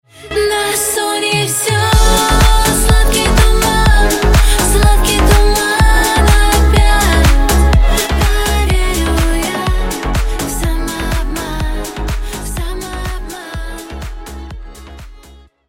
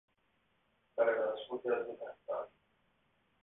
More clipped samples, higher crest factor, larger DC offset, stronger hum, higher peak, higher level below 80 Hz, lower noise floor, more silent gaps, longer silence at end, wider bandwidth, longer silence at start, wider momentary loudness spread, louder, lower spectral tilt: neither; second, 12 dB vs 22 dB; neither; neither; first, 0 dBFS vs -18 dBFS; first, -14 dBFS vs -84 dBFS; second, -41 dBFS vs -77 dBFS; neither; second, 0.5 s vs 0.95 s; first, 17 kHz vs 3.9 kHz; second, 0.2 s vs 0.95 s; about the same, 14 LU vs 14 LU; first, -13 LUFS vs -37 LUFS; first, -4 dB/octave vs 1.5 dB/octave